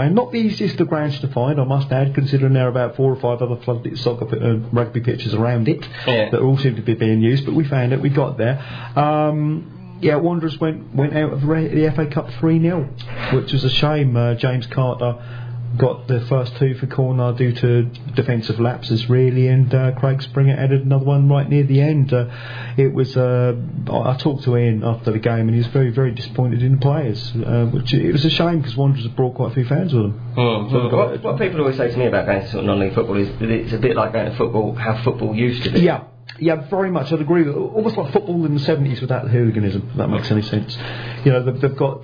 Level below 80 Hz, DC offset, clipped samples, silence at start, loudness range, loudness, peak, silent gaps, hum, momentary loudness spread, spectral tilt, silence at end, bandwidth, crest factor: -44 dBFS; under 0.1%; under 0.1%; 0 s; 3 LU; -18 LUFS; -2 dBFS; none; none; 6 LU; -9 dB/octave; 0 s; 5.2 kHz; 16 dB